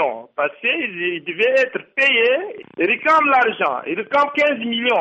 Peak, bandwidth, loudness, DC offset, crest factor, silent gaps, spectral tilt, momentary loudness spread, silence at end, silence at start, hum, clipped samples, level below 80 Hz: -6 dBFS; 8.4 kHz; -18 LUFS; under 0.1%; 14 dB; none; -4 dB/octave; 9 LU; 0 s; 0 s; none; under 0.1%; -68 dBFS